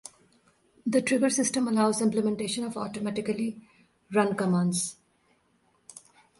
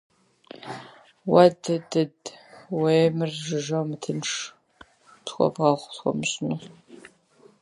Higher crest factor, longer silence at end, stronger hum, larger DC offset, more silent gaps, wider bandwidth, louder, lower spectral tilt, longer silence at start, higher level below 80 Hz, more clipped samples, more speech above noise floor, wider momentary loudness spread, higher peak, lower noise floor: about the same, 20 dB vs 24 dB; second, 0.4 s vs 0.55 s; neither; neither; neither; about the same, 11.5 kHz vs 11.5 kHz; second, -27 LUFS vs -24 LUFS; about the same, -4.5 dB/octave vs -5.5 dB/octave; first, 0.85 s vs 0.55 s; about the same, -68 dBFS vs -68 dBFS; neither; first, 42 dB vs 34 dB; about the same, 18 LU vs 20 LU; second, -10 dBFS vs -2 dBFS; first, -68 dBFS vs -57 dBFS